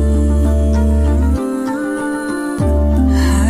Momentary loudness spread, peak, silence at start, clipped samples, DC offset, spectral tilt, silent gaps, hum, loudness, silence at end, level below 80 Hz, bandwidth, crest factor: 6 LU; -4 dBFS; 0 s; under 0.1%; under 0.1%; -7 dB/octave; none; none; -16 LUFS; 0 s; -16 dBFS; 12 kHz; 10 dB